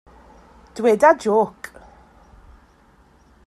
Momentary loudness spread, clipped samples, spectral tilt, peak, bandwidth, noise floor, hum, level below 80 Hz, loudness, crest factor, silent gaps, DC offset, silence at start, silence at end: 24 LU; under 0.1%; -5.5 dB/octave; -2 dBFS; 14 kHz; -54 dBFS; none; -54 dBFS; -17 LUFS; 20 dB; none; under 0.1%; 0.75 s; 2 s